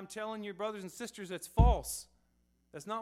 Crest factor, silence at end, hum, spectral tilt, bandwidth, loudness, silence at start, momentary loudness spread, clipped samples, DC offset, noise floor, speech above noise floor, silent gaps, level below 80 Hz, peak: 24 dB; 0 s; none; -5.5 dB/octave; 14.5 kHz; -35 LUFS; 0 s; 15 LU; under 0.1%; under 0.1%; -73 dBFS; 40 dB; none; -38 dBFS; -12 dBFS